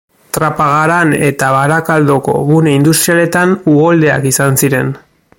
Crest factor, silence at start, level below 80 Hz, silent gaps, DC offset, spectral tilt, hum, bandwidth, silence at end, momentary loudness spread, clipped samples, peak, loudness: 10 dB; 0.35 s; -46 dBFS; none; under 0.1%; -5 dB/octave; none; 17 kHz; 0.4 s; 6 LU; under 0.1%; 0 dBFS; -10 LUFS